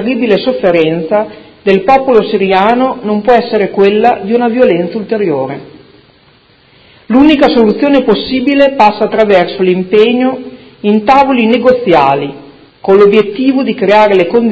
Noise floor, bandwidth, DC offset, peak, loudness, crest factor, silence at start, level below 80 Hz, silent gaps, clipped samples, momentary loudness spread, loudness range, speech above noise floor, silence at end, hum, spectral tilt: -45 dBFS; 8 kHz; under 0.1%; 0 dBFS; -9 LUFS; 10 dB; 0 s; -44 dBFS; none; 1%; 8 LU; 3 LU; 37 dB; 0 s; none; -7.5 dB/octave